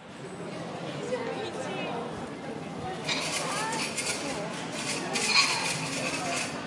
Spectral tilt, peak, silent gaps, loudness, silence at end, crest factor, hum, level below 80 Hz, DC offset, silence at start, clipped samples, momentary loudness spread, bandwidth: -2.5 dB/octave; -10 dBFS; none; -30 LUFS; 0 s; 22 dB; none; -66 dBFS; under 0.1%; 0 s; under 0.1%; 14 LU; 11.5 kHz